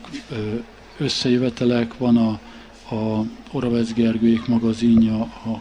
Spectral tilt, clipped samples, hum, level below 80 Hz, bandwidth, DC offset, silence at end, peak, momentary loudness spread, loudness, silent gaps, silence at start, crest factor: -6.5 dB/octave; under 0.1%; none; -46 dBFS; 9.6 kHz; under 0.1%; 0 s; -6 dBFS; 12 LU; -21 LUFS; none; 0 s; 14 dB